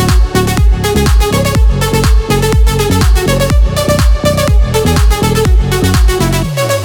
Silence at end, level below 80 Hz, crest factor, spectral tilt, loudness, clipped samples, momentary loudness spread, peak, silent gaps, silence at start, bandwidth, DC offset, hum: 0 s; -12 dBFS; 8 dB; -5 dB/octave; -11 LUFS; under 0.1%; 1 LU; 0 dBFS; none; 0 s; 18 kHz; under 0.1%; none